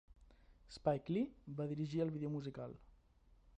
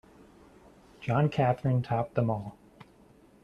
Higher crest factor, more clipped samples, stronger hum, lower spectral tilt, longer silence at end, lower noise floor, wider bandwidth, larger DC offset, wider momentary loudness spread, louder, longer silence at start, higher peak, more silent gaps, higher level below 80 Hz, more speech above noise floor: about the same, 20 dB vs 18 dB; neither; neither; about the same, -8.5 dB/octave vs -9 dB/octave; second, 0.7 s vs 0.9 s; first, -69 dBFS vs -58 dBFS; first, 9.4 kHz vs 6.8 kHz; neither; about the same, 13 LU vs 11 LU; second, -42 LUFS vs -29 LUFS; second, 0.2 s vs 1 s; second, -22 dBFS vs -12 dBFS; neither; second, -66 dBFS vs -60 dBFS; about the same, 28 dB vs 31 dB